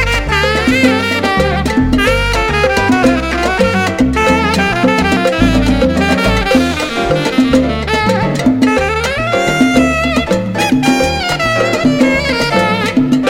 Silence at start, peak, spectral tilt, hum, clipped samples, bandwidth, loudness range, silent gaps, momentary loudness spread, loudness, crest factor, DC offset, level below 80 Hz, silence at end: 0 s; 0 dBFS; -5 dB/octave; none; under 0.1%; 16 kHz; 1 LU; none; 3 LU; -12 LUFS; 12 dB; under 0.1%; -24 dBFS; 0 s